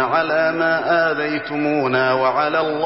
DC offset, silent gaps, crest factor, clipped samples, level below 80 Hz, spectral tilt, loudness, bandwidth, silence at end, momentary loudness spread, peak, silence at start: 0.2%; none; 12 dB; under 0.1%; -64 dBFS; -9 dB/octave; -18 LUFS; 5.8 kHz; 0 s; 4 LU; -6 dBFS; 0 s